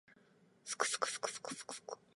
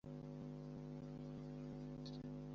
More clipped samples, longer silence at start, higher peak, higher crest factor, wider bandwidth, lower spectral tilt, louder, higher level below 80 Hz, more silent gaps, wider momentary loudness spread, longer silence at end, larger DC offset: neither; about the same, 0.1 s vs 0.05 s; first, -18 dBFS vs -42 dBFS; first, 26 dB vs 10 dB; first, 12 kHz vs 7.4 kHz; second, 0 dB/octave vs -8 dB/octave; first, -40 LUFS vs -52 LUFS; second, under -90 dBFS vs -66 dBFS; neither; first, 12 LU vs 1 LU; first, 0.2 s vs 0 s; neither